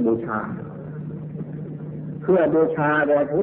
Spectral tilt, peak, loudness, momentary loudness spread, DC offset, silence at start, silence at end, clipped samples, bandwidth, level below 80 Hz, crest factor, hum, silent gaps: -12.5 dB/octave; -8 dBFS; -23 LUFS; 15 LU; under 0.1%; 0 s; 0 s; under 0.1%; 3.8 kHz; -56 dBFS; 14 dB; none; none